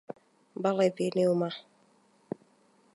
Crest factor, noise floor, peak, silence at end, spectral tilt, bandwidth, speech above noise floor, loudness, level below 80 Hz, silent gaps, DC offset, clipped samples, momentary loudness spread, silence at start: 18 dB; -65 dBFS; -14 dBFS; 1.35 s; -6.5 dB/octave; 11.5 kHz; 37 dB; -29 LUFS; -80 dBFS; none; under 0.1%; under 0.1%; 20 LU; 0.1 s